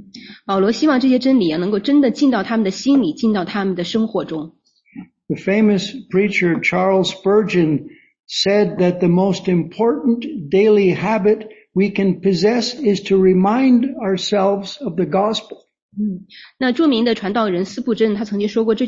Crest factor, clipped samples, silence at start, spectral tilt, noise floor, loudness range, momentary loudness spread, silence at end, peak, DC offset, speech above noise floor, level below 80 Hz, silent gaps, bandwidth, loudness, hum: 14 dB; under 0.1%; 0 s; -6 dB/octave; -39 dBFS; 4 LU; 10 LU; 0 s; -4 dBFS; under 0.1%; 23 dB; -56 dBFS; 15.82-15.89 s; 7.8 kHz; -17 LUFS; none